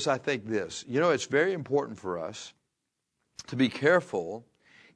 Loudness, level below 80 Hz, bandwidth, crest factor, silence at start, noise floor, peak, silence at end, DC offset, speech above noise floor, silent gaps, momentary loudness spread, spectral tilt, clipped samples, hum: -28 LUFS; -72 dBFS; 10.5 kHz; 20 dB; 0 s; -83 dBFS; -10 dBFS; 0.55 s; under 0.1%; 54 dB; none; 19 LU; -5 dB/octave; under 0.1%; none